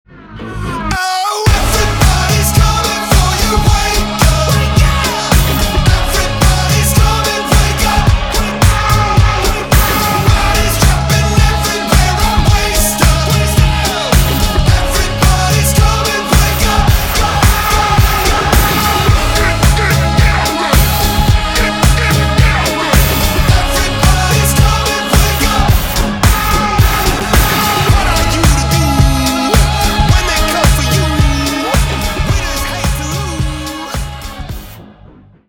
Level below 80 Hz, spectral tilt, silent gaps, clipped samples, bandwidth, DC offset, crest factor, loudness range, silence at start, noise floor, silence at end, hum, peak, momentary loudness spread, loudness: -16 dBFS; -4 dB/octave; none; under 0.1%; over 20 kHz; under 0.1%; 10 dB; 1 LU; 0.15 s; -40 dBFS; 0.65 s; none; 0 dBFS; 5 LU; -11 LUFS